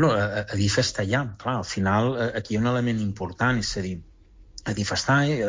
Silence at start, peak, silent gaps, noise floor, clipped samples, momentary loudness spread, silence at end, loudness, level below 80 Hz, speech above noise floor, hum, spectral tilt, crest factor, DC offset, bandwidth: 0 s; -10 dBFS; none; -47 dBFS; under 0.1%; 9 LU; 0 s; -25 LUFS; -44 dBFS; 23 dB; none; -5 dB/octave; 16 dB; under 0.1%; 7.6 kHz